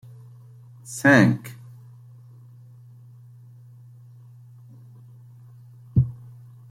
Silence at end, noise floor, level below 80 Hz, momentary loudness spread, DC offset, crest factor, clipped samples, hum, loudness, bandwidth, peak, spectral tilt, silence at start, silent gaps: 0.55 s; -47 dBFS; -52 dBFS; 30 LU; under 0.1%; 24 dB; under 0.1%; none; -20 LUFS; 15.5 kHz; -4 dBFS; -6.5 dB/octave; 0.9 s; none